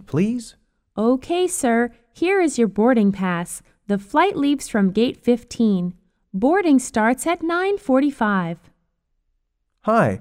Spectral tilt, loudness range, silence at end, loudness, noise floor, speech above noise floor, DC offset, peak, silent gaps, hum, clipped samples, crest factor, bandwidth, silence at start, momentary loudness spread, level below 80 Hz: -5.5 dB/octave; 2 LU; 0 s; -20 LUFS; -71 dBFS; 52 dB; under 0.1%; -4 dBFS; none; none; under 0.1%; 16 dB; 15.5 kHz; 0.1 s; 10 LU; -54 dBFS